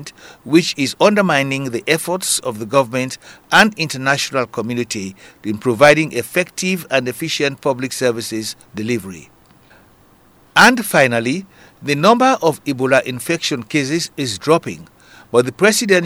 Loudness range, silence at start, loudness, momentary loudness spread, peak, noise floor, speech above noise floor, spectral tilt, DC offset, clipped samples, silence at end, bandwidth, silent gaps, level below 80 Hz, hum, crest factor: 5 LU; 0 s; -16 LUFS; 13 LU; 0 dBFS; -50 dBFS; 33 dB; -4 dB/octave; under 0.1%; 0.2%; 0 s; over 20 kHz; none; -58 dBFS; none; 18 dB